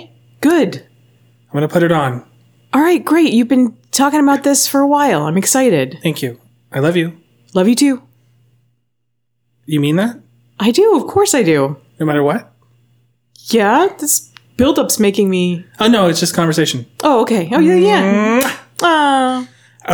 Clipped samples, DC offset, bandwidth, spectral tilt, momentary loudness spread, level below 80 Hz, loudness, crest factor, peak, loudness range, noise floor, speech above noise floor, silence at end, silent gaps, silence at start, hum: under 0.1%; under 0.1%; over 20 kHz; -4.5 dB/octave; 9 LU; -52 dBFS; -14 LUFS; 12 dB; -2 dBFS; 5 LU; -72 dBFS; 59 dB; 0 s; none; 0 s; none